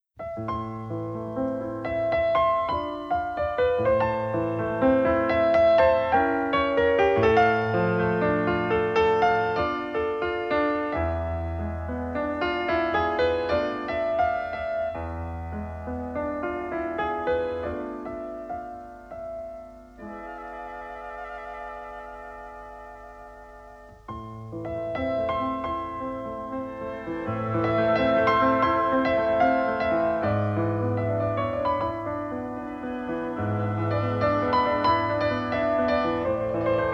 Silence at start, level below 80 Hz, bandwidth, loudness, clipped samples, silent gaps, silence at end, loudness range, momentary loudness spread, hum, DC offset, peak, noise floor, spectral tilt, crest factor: 0.2 s; -46 dBFS; 7.2 kHz; -25 LUFS; under 0.1%; none; 0 s; 16 LU; 17 LU; none; under 0.1%; -8 dBFS; -47 dBFS; -8 dB/octave; 18 dB